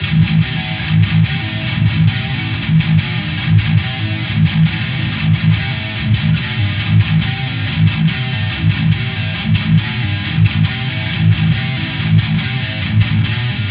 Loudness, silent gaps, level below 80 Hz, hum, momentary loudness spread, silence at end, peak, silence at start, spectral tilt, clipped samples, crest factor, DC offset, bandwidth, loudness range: -15 LUFS; none; -34 dBFS; none; 6 LU; 0 s; -2 dBFS; 0 s; -10 dB/octave; under 0.1%; 12 dB; under 0.1%; 5 kHz; 1 LU